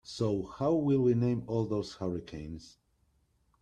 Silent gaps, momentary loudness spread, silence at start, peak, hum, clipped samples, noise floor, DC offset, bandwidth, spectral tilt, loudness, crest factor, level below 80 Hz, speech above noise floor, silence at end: none; 16 LU; 0.05 s; -16 dBFS; none; under 0.1%; -72 dBFS; under 0.1%; 9.8 kHz; -8 dB/octave; -31 LUFS; 16 dB; -58 dBFS; 41 dB; 0.95 s